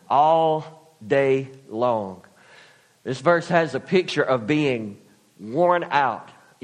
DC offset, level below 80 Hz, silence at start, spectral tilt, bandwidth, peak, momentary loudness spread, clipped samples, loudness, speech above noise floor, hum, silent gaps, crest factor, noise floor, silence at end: under 0.1%; -66 dBFS; 0.1 s; -6 dB/octave; 10.5 kHz; -4 dBFS; 16 LU; under 0.1%; -22 LUFS; 32 dB; none; none; 20 dB; -53 dBFS; 0.4 s